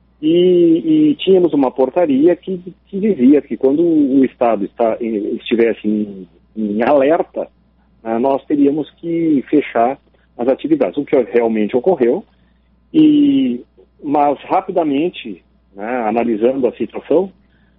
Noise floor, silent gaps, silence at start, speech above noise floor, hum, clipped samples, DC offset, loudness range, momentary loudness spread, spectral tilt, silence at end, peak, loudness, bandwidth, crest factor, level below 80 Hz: -54 dBFS; none; 0.2 s; 39 dB; none; under 0.1%; under 0.1%; 4 LU; 13 LU; -5.5 dB/octave; 0.5 s; -2 dBFS; -15 LUFS; 4 kHz; 14 dB; -56 dBFS